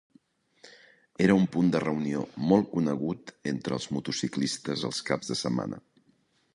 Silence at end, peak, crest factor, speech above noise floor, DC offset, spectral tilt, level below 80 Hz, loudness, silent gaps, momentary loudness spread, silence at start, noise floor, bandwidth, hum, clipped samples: 0.75 s; -8 dBFS; 20 dB; 40 dB; under 0.1%; -5.5 dB/octave; -62 dBFS; -28 LUFS; none; 11 LU; 0.65 s; -68 dBFS; 11.5 kHz; none; under 0.1%